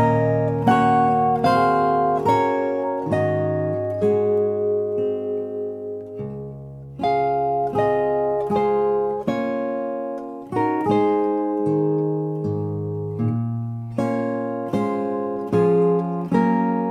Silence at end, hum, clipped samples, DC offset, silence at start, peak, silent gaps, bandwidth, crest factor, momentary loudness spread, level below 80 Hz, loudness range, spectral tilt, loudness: 0 s; none; under 0.1%; under 0.1%; 0 s; -4 dBFS; none; 11.5 kHz; 16 dB; 10 LU; -54 dBFS; 5 LU; -8.5 dB/octave; -21 LUFS